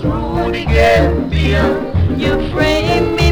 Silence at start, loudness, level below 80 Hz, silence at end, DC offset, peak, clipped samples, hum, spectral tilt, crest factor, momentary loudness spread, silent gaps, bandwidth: 0 s; -14 LUFS; -20 dBFS; 0 s; under 0.1%; 0 dBFS; under 0.1%; none; -6.5 dB/octave; 12 dB; 6 LU; none; 16.5 kHz